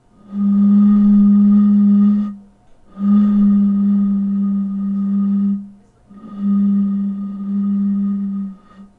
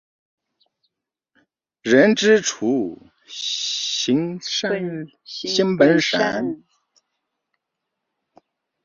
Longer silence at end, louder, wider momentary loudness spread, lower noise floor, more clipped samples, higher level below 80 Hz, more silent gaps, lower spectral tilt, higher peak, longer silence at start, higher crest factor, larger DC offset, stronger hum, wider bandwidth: second, 0.15 s vs 2.3 s; first, -15 LUFS vs -19 LUFS; about the same, 13 LU vs 15 LU; second, -46 dBFS vs -80 dBFS; neither; first, -50 dBFS vs -64 dBFS; neither; first, -12 dB/octave vs -4 dB/octave; second, -6 dBFS vs -2 dBFS; second, 0.3 s vs 1.85 s; second, 10 dB vs 20 dB; neither; neither; second, 2 kHz vs 7.4 kHz